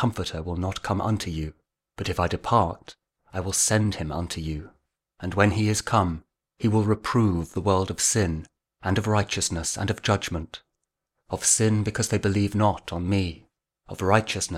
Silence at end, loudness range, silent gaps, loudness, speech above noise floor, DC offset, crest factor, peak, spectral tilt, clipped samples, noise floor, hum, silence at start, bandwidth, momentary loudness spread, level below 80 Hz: 0 s; 3 LU; none; -25 LUFS; 57 dB; under 0.1%; 22 dB; -4 dBFS; -4.5 dB/octave; under 0.1%; -81 dBFS; none; 0 s; 15.5 kHz; 12 LU; -44 dBFS